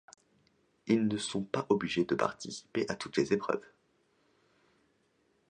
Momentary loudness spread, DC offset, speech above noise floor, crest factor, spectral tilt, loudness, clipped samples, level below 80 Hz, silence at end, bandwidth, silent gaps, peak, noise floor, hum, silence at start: 8 LU; under 0.1%; 41 dB; 22 dB; -5 dB/octave; -33 LUFS; under 0.1%; -70 dBFS; 1.9 s; 10 kHz; none; -12 dBFS; -73 dBFS; none; 0.85 s